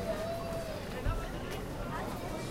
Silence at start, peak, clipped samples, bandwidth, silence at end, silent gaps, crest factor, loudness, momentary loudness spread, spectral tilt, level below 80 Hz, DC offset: 0 s; -20 dBFS; under 0.1%; 16 kHz; 0 s; none; 18 dB; -38 LUFS; 3 LU; -5.5 dB/octave; -42 dBFS; under 0.1%